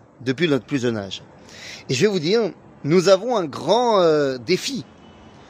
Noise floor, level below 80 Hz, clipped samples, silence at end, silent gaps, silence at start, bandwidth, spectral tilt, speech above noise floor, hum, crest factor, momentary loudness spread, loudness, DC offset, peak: -45 dBFS; -62 dBFS; under 0.1%; 0.65 s; none; 0.2 s; 15.5 kHz; -5 dB/octave; 25 dB; none; 18 dB; 16 LU; -20 LUFS; under 0.1%; -2 dBFS